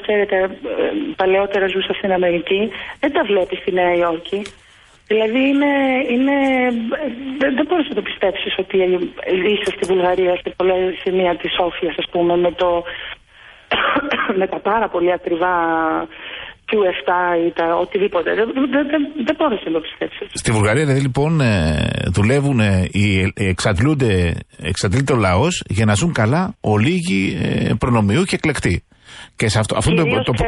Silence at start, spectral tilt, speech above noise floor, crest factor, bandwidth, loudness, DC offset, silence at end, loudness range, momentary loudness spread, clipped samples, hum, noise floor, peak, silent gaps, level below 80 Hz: 0 s; -6 dB/octave; 27 dB; 12 dB; 11.5 kHz; -18 LUFS; under 0.1%; 0 s; 2 LU; 7 LU; under 0.1%; none; -45 dBFS; -4 dBFS; none; -38 dBFS